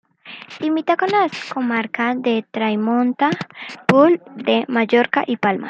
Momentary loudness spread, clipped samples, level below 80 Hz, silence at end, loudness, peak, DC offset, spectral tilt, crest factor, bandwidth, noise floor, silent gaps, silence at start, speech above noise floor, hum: 10 LU; under 0.1%; -68 dBFS; 0 s; -18 LUFS; -2 dBFS; under 0.1%; -6.5 dB/octave; 18 dB; 8.6 kHz; -39 dBFS; none; 0.25 s; 21 dB; none